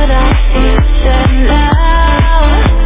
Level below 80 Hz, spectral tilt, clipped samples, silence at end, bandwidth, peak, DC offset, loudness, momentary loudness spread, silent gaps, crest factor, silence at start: -8 dBFS; -10.5 dB/octave; 0.4%; 0 s; 3.8 kHz; 0 dBFS; under 0.1%; -10 LUFS; 1 LU; none; 6 dB; 0 s